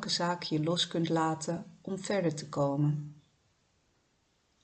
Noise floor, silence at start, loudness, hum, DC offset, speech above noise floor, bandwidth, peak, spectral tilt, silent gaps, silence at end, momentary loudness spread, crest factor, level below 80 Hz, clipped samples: -73 dBFS; 0 s; -32 LUFS; none; under 0.1%; 42 dB; 9 kHz; -18 dBFS; -5 dB/octave; none; 1.5 s; 10 LU; 16 dB; -72 dBFS; under 0.1%